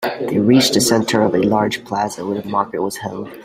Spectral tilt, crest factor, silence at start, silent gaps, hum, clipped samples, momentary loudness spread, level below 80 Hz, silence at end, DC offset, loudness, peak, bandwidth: -4.5 dB/octave; 16 dB; 0 s; none; none; under 0.1%; 11 LU; -52 dBFS; 0 s; under 0.1%; -17 LUFS; 0 dBFS; 16 kHz